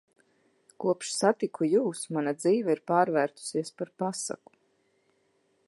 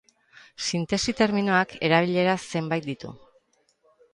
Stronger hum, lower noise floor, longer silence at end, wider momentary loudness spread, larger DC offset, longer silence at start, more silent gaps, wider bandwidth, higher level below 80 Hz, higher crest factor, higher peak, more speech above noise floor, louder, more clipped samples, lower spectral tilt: neither; first, -71 dBFS vs -66 dBFS; first, 1.35 s vs 1 s; second, 8 LU vs 11 LU; neither; first, 0.8 s vs 0.6 s; neither; about the same, 11.5 kHz vs 11.5 kHz; second, -84 dBFS vs -58 dBFS; about the same, 20 dB vs 20 dB; about the same, -8 dBFS vs -8 dBFS; about the same, 43 dB vs 42 dB; second, -28 LUFS vs -24 LUFS; neither; about the same, -4.5 dB/octave vs -4.5 dB/octave